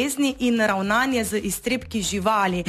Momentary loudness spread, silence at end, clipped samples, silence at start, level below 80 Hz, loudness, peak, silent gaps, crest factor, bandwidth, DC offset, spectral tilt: 5 LU; 0 s; under 0.1%; 0 s; -46 dBFS; -22 LUFS; -8 dBFS; none; 14 dB; 14 kHz; under 0.1%; -4 dB/octave